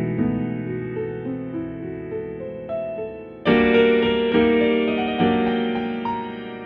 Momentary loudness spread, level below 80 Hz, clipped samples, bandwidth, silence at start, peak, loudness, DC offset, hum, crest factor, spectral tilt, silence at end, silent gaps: 14 LU; -48 dBFS; under 0.1%; 5.2 kHz; 0 s; -4 dBFS; -22 LUFS; under 0.1%; none; 18 dB; -9 dB/octave; 0 s; none